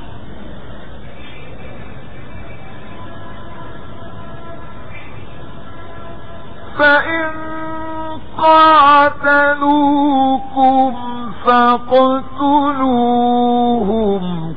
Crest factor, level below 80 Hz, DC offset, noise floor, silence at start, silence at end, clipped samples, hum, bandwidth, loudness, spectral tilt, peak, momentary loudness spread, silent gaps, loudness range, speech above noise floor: 14 dB; -42 dBFS; 6%; -34 dBFS; 0 s; 0 s; under 0.1%; none; 5.2 kHz; -13 LUFS; -8.5 dB/octave; -2 dBFS; 23 LU; none; 22 LU; 21 dB